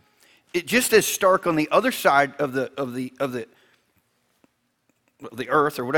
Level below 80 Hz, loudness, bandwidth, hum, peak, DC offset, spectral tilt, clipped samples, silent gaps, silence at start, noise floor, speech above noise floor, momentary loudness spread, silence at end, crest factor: -62 dBFS; -22 LUFS; 19.5 kHz; none; -4 dBFS; under 0.1%; -3.5 dB/octave; under 0.1%; none; 0.55 s; -70 dBFS; 48 dB; 13 LU; 0 s; 20 dB